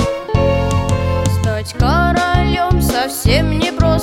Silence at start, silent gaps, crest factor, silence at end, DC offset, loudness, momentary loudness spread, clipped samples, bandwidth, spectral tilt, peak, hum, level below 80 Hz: 0 s; none; 14 dB; 0 s; under 0.1%; -15 LUFS; 3 LU; under 0.1%; 17 kHz; -5.5 dB/octave; 0 dBFS; none; -22 dBFS